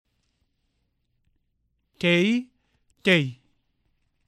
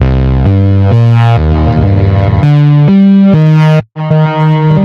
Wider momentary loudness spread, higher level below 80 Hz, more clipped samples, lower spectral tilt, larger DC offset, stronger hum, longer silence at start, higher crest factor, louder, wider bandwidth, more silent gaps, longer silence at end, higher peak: first, 8 LU vs 4 LU; second, -70 dBFS vs -18 dBFS; second, under 0.1% vs 0.9%; second, -5.5 dB/octave vs -9.5 dB/octave; neither; neither; first, 2 s vs 0 s; first, 22 dB vs 6 dB; second, -23 LUFS vs -7 LUFS; first, 12 kHz vs 6 kHz; neither; first, 0.95 s vs 0 s; second, -6 dBFS vs 0 dBFS